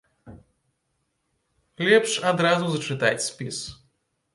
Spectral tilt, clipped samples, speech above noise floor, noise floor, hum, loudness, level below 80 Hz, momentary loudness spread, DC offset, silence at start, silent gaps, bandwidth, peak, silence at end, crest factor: -4 dB/octave; under 0.1%; 52 dB; -75 dBFS; none; -23 LUFS; -62 dBFS; 13 LU; under 0.1%; 0.25 s; none; 11.5 kHz; -4 dBFS; 0.6 s; 22 dB